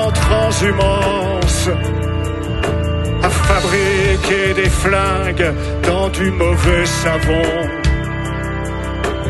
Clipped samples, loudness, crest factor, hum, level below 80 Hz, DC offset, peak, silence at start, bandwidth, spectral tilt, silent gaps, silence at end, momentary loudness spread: under 0.1%; -16 LUFS; 14 dB; none; -22 dBFS; under 0.1%; -2 dBFS; 0 s; 12.5 kHz; -5 dB/octave; none; 0 s; 7 LU